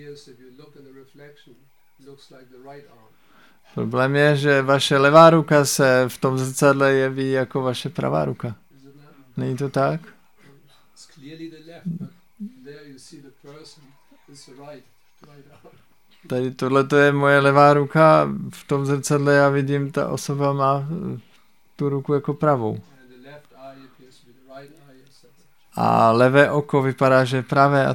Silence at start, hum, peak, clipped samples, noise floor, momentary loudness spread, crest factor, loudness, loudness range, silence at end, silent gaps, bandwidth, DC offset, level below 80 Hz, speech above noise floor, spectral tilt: 0 s; none; 0 dBFS; under 0.1%; -60 dBFS; 19 LU; 20 dB; -18 LUFS; 20 LU; 0 s; none; 17.5 kHz; 0.2%; -62 dBFS; 40 dB; -5.5 dB/octave